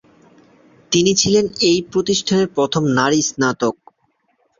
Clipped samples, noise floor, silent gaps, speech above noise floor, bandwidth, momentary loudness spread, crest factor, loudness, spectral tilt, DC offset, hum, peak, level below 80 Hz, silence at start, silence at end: under 0.1%; -65 dBFS; none; 48 dB; 7.6 kHz; 5 LU; 18 dB; -17 LUFS; -4 dB/octave; under 0.1%; none; -2 dBFS; -52 dBFS; 0.9 s; 0.85 s